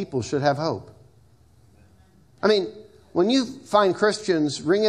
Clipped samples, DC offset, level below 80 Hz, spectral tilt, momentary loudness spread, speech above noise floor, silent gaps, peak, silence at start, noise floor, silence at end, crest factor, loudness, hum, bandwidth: under 0.1%; under 0.1%; -62 dBFS; -5 dB/octave; 8 LU; 34 dB; none; -4 dBFS; 0 s; -56 dBFS; 0 s; 20 dB; -23 LUFS; none; 11.5 kHz